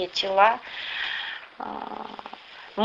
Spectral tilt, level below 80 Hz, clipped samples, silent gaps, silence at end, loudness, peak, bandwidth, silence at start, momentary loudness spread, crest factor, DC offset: -3 dB/octave; -66 dBFS; under 0.1%; none; 0 s; -26 LUFS; -6 dBFS; 7.8 kHz; 0 s; 20 LU; 22 dB; under 0.1%